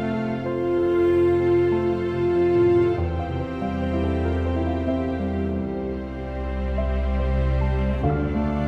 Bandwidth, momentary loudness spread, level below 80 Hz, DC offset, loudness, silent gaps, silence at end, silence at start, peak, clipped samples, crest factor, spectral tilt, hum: 6 kHz; 9 LU; -30 dBFS; under 0.1%; -23 LUFS; none; 0 s; 0 s; -8 dBFS; under 0.1%; 14 dB; -9.5 dB/octave; none